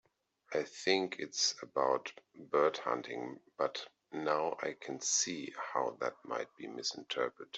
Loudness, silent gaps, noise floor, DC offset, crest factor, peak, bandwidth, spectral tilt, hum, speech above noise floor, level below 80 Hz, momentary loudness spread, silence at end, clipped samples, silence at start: -36 LUFS; none; -57 dBFS; under 0.1%; 22 dB; -16 dBFS; 8.2 kHz; -1.5 dB/octave; none; 20 dB; -84 dBFS; 11 LU; 0 s; under 0.1%; 0.5 s